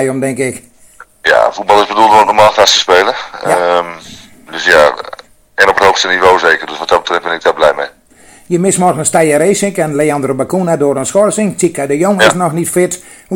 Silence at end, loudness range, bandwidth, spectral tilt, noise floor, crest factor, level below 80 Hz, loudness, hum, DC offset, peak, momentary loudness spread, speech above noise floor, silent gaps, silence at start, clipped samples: 0 s; 3 LU; over 20 kHz; -3.5 dB/octave; -41 dBFS; 12 dB; -46 dBFS; -10 LUFS; none; under 0.1%; 0 dBFS; 10 LU; 31 dB; none; 0 s; 2%